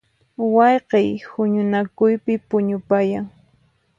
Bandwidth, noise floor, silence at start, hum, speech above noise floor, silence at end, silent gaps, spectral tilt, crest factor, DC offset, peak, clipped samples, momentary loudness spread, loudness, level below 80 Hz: 7.2 kHz; -60 dBFS; 0.4 s; none; 42 dB; 0.7 s; none; -8.5 dB/octave; 16 dB; under 0.1%; -2 dBFS; under 0.1%; 8 LU; -19 LUFS; -62 dBFS